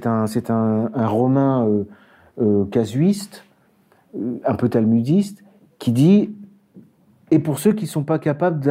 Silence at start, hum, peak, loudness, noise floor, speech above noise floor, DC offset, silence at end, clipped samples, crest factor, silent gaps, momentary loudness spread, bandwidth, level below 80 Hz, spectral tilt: 0 s; none; -4 dBFS; -19 LUFS; -57 dBFS; 39 dB; under 0.1%; 0 s; under 0.1%; 16 dB; none; 11 LU; 16 kHz; -62 dBFS; -8 dB/octave